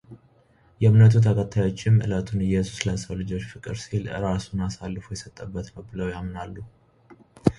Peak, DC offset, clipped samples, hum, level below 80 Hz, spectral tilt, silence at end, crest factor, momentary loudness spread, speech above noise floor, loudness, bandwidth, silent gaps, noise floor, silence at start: -2 dBFS; under 0.1%; under 0.1%; none; -44 dBFS; -7 dB/octave; 0.05 s; 22 dB; 19 LU; 36 dB; -24 LUFS; 11 kHz; none; -59 dBFS; 0.1 s